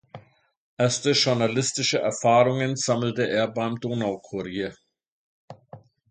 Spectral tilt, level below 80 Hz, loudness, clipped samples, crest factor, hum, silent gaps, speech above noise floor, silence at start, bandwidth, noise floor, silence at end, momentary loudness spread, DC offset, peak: -4 dB/octave; -64 dBFS; -24 LUFS; under 0.1%; 18 dB; none; 0.57-0.77 s, 5.08-5.48 s; 29 dB; 0.15 s; 9.6 kHz; -52 dBFS; 0.35 s; 11 LU; under 0.1%; -6 dBFS